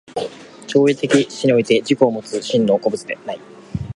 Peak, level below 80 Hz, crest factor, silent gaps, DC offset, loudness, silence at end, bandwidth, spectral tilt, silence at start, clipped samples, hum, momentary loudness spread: 0 dBFS; -50 dBFS; 18 dB; none; under 0.1%; -18 LUFS; 0.05 s; 11.5 kHz; -5.5 dB/octave; 0.15 s; under 0.1%; none; 16 LU